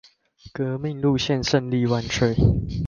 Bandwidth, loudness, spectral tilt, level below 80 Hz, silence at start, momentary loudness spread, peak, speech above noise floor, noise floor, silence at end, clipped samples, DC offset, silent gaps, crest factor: 7.2 kHz; -22 LUFS; -6 dB/octave; -36 dBFS; 0.45 s; 8 LU; -4 dBFS; 28 dB; -50 dBFS; 0 s; under 0.1%; under 0.1%; none; 18 dB